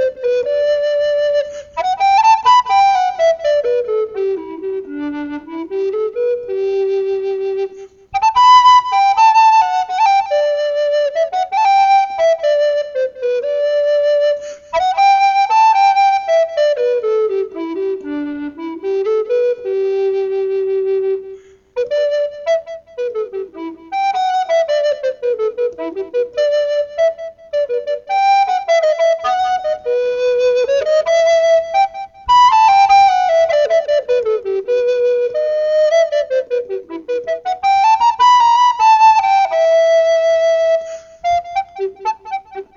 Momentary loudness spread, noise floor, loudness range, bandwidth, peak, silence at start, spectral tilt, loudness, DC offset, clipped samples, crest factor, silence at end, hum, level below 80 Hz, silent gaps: 13 LU; -36 dBFS; 7 LU; 7.6 kHz; 0 dBFS; 0 s; -2.5 dB/octave; -14 LUFS; under 0.1%; under 0.1%; 14 dB; 0.15 s; none; -54 dBFS; none